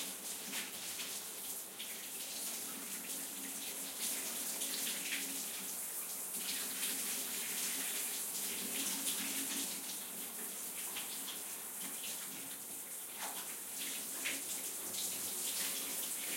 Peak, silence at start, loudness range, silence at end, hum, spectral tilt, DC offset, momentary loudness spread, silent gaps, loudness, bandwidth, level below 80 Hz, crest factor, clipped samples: -24 dBFS; 0 s; 4 LU; 0 s; none; 0.5 dB/octave; under 0.1%; 6 LU; none; -39 LUFS; 16.5 kHz; under -90 dBFS; 18 dB; under 0.1%